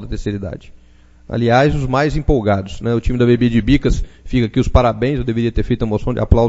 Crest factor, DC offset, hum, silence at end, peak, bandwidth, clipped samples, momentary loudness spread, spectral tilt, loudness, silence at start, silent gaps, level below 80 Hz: 14 dB; under 0.1%; none; 0 s; 0 dBFS; 8 kHz; under 0.1%; 10 LU; -7.5 dB/octave; -17 LUFS; 0 s; none; -24 dBFS